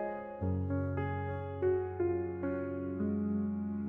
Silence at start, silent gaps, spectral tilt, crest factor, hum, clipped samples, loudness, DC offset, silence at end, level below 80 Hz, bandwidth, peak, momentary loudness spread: 0 s; none; -12 dB/octave; 14 dB; none; under 0.1%; -35 LUFS; under 0.1%; 0 s; -66 dBFS; 3.6 kHz; -20 dBFS; 5 LU